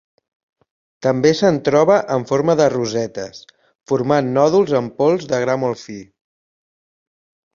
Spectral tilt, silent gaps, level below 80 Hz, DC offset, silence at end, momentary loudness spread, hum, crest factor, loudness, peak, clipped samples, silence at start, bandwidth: -6 dB/octave; 3.75-3.79 s; -58 dBFS; under 0.1%; 1.5 s; 12 LU; none; 16 dB; -17 LUFS; -2 dBFS; under 0.1%; 1 s; 7.4 kHz